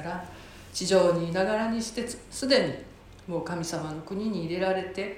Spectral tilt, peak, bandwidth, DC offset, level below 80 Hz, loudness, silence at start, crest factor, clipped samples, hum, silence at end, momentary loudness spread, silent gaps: -4.5 dB/octave; -8 dBFS; 16 kHz; under 0.1%; -54 dBFS; -28 LUFS; 0 s; 20 dB; under 0.1%; none; 0 s; 16 LU; none